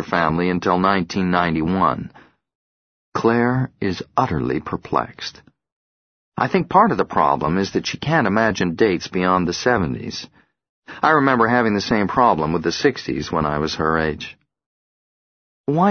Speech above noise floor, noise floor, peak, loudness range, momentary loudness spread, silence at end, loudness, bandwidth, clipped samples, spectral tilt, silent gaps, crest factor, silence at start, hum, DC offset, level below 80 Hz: over 71 dB; under -90 dBFS; 0 dBFS; 4 LU; 12 LU; 0 s; -19 LUFS; 6.6 kHz; under 0.1%; -6 dB/octave; 2.55-3.12 s, 5.72-6.32 s, 10.69-10.82 s, 14.66-15.64 s; 20 dB; 0 s; none; under 0.1%; -46 dBFS